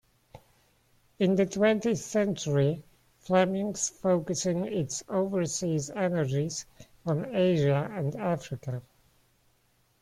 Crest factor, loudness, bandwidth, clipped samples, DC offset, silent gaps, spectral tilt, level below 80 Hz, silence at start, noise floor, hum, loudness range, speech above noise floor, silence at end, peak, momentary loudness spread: 18 dB; -29 LUFS; 14.5 kHz; under 0.1%; under 0.1%; none; -5.5 dB/octave; -62 dBFS; 0.35 s; -69 dBFS; none; 3 LU; 41 dB; 1.2 s; -12 dBFS; 10 LU